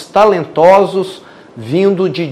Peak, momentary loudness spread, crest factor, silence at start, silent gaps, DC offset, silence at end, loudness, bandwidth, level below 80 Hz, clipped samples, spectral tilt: 0 dBFS; 13 LU; 12 dB; 0 s; none; under 0.1%; 0 s; -11 LUFS; 12.5 kHz; -52 dBFS; 2%; -6.5 dB/octave